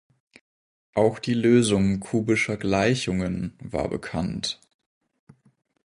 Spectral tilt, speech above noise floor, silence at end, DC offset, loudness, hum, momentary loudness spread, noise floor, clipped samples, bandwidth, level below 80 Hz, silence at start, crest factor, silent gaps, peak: -5.5 dB/octave; over 67 dB; 1.3 s; under 0.1%; -24 LUFS; none; 11 LU; under -90 dBFS; under 0.1%; 11 kHz; -48 dBFS; 0.95 s; 20 dB; none; -6 dBFS